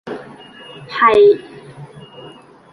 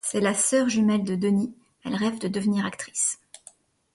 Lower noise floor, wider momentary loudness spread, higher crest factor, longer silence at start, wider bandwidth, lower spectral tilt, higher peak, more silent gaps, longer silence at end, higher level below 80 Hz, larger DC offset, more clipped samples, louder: second, -40 dBFS vs -54 dBFS; first, 27 LU vs 11 LU; about the same, 16 dB vs 16 dB; about the same, 0.05 s vs 0.05 s; second, 9.6 kHz vs 11.5 kHz; first, -6 dB/octave vs -4.5 dB/octave; first, -2 dBFS vs -10 dBFS; neither; second, 0.45 s vs 0.8 s; first, -56 dBFS vs -66 dBFS; neither; neither; first, -13 LUFS vs -25 LUFS